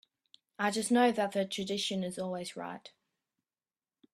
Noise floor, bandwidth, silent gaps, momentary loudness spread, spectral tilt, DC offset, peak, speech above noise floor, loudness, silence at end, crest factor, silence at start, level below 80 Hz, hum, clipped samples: under -90 dBFS; 14.5 kHz; none; 15 LU; -4 dB/octave; under 0.1%; -14 dBFS; over 58 dB; -32 LUFS; 1.25 s; 20 dB; 0.6 s; -76 dBFS; none; under 0.1%